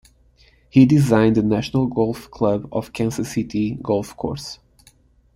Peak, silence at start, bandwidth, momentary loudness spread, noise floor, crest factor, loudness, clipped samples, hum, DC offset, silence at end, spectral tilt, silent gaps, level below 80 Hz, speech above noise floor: -2 dBFS; 0.75 s; 16 kHz; 14 LU; -54 dBFS; 18 dB; -20 LUFS; under 0.1%; none; under 0.1%; 0.8 s; -7 dB/octave; none; -48 dBFS; 36 dB